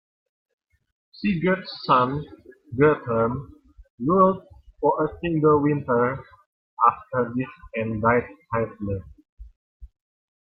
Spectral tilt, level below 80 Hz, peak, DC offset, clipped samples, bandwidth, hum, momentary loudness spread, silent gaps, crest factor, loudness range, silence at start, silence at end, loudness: -10.5 dB/octave; -52 dBFS; -4 dBFS; under 0.1%; under 0.1%; 5.6 kHz; none; 12 LU; 3.90-3.98 s, 6.46-6.77 s, 9.29-9.37 s, 9.56-9.80 s; 22 dB; 3 LU; 1.2 s; 0.6 s; -23 LUFS